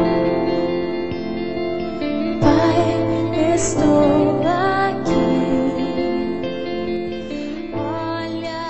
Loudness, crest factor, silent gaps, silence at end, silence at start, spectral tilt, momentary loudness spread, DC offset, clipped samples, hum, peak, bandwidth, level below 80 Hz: -20 LUFS; 16 dB; none; 0 s; 0 s; -6 dB/octave; 10 LU; 1%; under 0.1%; none; -4 dBFS; 8.4 kHz; -40 dBFS